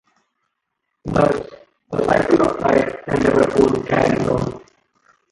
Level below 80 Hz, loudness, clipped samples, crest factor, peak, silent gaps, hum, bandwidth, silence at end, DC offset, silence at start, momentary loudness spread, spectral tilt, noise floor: -42 dBFS; -18 LUFS; under 0.1%; 16 dB; -2 dBFS; none; none; 11.5 kHz; 0.75 s; under 0.1%; 1.05 s; 12 LU; -7 dB/octave; -76 dBFS